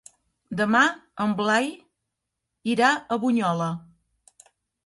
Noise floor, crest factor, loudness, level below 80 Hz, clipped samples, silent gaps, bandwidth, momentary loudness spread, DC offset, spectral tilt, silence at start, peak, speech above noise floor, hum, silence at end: -82 dBFS; 20 dB; -23 LUFS; -68 dBFS; under 0.1%; none; 11.5 kHz; 12 LU; under 0.1%; -5 dB/octave; 0.5 s; -6 dBFS; 59 dB; none; 1.05 s